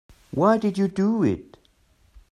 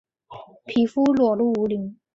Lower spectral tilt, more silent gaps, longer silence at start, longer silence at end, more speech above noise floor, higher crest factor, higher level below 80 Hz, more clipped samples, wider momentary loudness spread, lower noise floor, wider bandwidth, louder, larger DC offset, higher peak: about the same, -8 dB/octave vs -7.5 dB/octave; neither; about the same, 0.35 s vs 0.3 s; first, 0.9 s vs 0.25 s; first, 39 dB vs 23 dB; about the same, 18 dB vs 14 dB; about the same, -56 dBFS vs -60 dBFS; neither; about the same, 10 LU vs 9 LU; first, -61 dBFS vs -44 dBFS; first, 10.5 kHz vs 7.6 kHz; about the same, -23 LUFS vs -21 LUFS; neither; about the same, -6 dBFS vs -8 dBFS